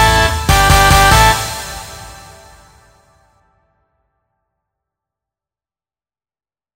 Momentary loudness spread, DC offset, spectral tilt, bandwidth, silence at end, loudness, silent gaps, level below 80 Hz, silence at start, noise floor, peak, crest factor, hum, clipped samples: 21 LU; under 0.1%; -3 dB/octave; 16.5 kHz; 4.6 s; -10 LUFS; none; -24 dBFS; 0 s; under -90 dBFS; 0 dBFS; 16 dB; none; under 0.1%